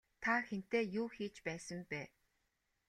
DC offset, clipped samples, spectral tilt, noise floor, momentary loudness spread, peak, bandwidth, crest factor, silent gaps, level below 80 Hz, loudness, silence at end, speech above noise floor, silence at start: under 0.1%; under 0.1%; -5 dB/octave; -84 dBFS; 10 LU; -22 dBFS; 13 kHz; 20 dB; none; -76 dBFS; -40 LUFS; 0.8 s; 43 dB; 0.2 s